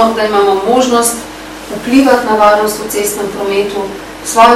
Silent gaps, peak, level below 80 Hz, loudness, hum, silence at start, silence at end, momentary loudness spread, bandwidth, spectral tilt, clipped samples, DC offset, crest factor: none; 0 dBFS; -42 dBFS; -11 LUFS; none; 0 s; 0 s; 14 LU; 16.5 kHz; -3 dB/octave; 2%; 0.1%; 10 dB